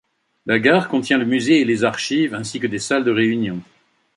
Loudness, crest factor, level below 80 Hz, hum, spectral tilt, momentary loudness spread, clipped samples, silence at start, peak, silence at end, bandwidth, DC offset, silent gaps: -18 LUFS; 18 dB; -60 dBFS; none; -5 dB/octave; 9 LU; under 0.1%; 0.45 s; -2 dBFS; 0.55 s; 11.5 kHz; under 0.1%; none